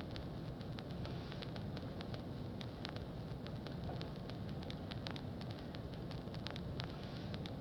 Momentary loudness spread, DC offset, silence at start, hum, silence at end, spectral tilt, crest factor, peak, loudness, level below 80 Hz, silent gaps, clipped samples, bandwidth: 2 LU; under 0.1%; 0 s; none; 0 s; -7 dB/octave; 24 dB; -22 dBFS; -46 LUFS; -56 dBFS; none; under 0.1%; 19 kHz